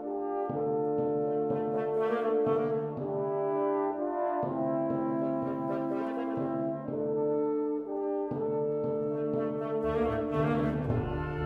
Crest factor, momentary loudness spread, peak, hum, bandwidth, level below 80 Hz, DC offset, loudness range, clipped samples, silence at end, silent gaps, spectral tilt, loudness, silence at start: 14 dB; 4 LU; -16 dBFS; none; 4.7 kHz; -54 dBFS; under 0.1%; 2 LU; under 0.1%; 0 s; none; -10 dB/octave; -31 LUFS; 0 s